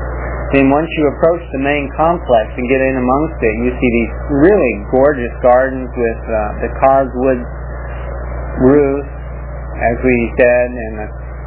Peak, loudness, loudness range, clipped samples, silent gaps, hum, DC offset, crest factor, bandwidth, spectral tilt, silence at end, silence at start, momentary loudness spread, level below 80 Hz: 0 dBFS; -14 LUFS; 3 LU; under 0.1%; none; 60 Hz at -25 dBFS; under 0.1%; 14 dB; 4 kHz; -11 dB/octave; 0 s; 0 s; 14 LU; -26 dBFS